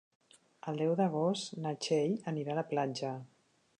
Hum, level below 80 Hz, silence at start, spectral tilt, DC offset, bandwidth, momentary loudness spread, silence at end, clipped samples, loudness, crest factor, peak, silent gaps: none; -84 dBFS; 0.65 s; -6 dB/octave; under 0.1%; 10.5 kHz; 10 LU; 0.55 s; under 0.1%; -34 LUFS; 16 dB; -20 dBFS; none